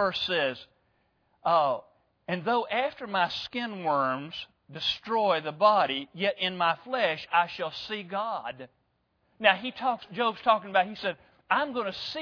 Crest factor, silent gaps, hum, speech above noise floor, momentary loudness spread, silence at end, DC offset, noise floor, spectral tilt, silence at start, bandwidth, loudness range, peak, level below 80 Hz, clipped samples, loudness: 24 dB; none; none; 45 dB; 11 LU; 0 s; under 0.1%; -73 dBFS; -5 dB/octave; 0 s; 5.4 kHz; 3 LU; -6 dBFS; -70 dBFS; under 0.1%; -28 LUFS